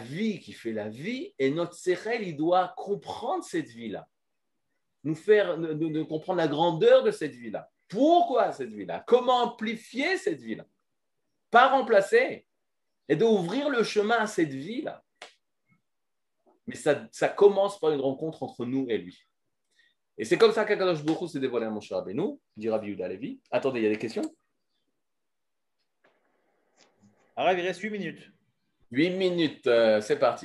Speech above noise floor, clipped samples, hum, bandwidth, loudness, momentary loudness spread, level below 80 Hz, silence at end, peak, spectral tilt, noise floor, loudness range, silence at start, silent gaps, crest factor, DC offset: 61 dB; under 0.1%; none; 12 kHz; -27 LUFS; 15 LU; -80 dBFS; 0 s; -6 dBFS; -5.5 dB/octave; -88 dBFS; 9 LU; 0 s; none; 22 dB; under 0.1%